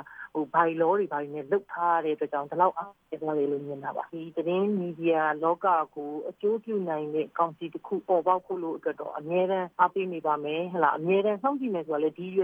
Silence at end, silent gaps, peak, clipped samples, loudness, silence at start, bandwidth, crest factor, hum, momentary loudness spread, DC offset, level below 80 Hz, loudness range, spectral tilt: 0 s; none; -8 dBFS; under 0.1%; -28 LUFS; 0 s; 4.5 kHz; 20 dB; none; 10 LU; under 0.1%; -78 dBFS; 2 LU; -9 dB/octave